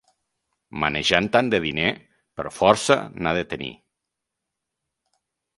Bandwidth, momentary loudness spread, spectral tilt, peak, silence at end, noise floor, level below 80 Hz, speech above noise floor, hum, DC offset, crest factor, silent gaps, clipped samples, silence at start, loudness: 11.5 kHz; 16 LU; -4 dB/octave; 0 dBFS; 1.85 s; -83 dBFS; -52 dBFS; 61 dB; none; under 0.1%; 24 dB; none; under 0.1%; 0.75 s; -21 LUFS